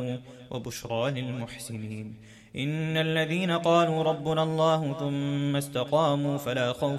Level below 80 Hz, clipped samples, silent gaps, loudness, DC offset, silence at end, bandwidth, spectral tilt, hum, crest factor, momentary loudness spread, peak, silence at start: -62 dBFS; under 0.1%; none; -28 LUFS; under 0.1%; 0 s; 15 kHz; -6 dB/octave; none; 18 dB; 14 LU; -10 dBFS; 0 s